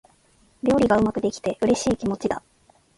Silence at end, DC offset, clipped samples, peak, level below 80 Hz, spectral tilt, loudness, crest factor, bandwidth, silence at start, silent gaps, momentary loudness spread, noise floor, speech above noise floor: 0.6 s; under 0.1%; under 0.1%; -6 dBFS; -48 dBFS; -5.5 dB/octave; -23 LUFS; 18 dB; 11.5 kHz; 0.65 s; none; 9 LU; -59 dBFS; 38 dB